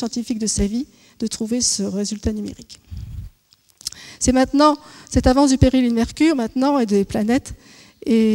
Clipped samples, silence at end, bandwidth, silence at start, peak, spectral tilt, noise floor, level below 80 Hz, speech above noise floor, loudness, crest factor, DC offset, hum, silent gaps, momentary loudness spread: under 0.1%; 0 s; 16.5 kHz; 0 s; 0 dBFS; -4.5 dB/octave; -57 dBFS; -34 dBFS; 39 dB; -19 LUFS; 18 dB; under 0.1%; none; none; 19 LU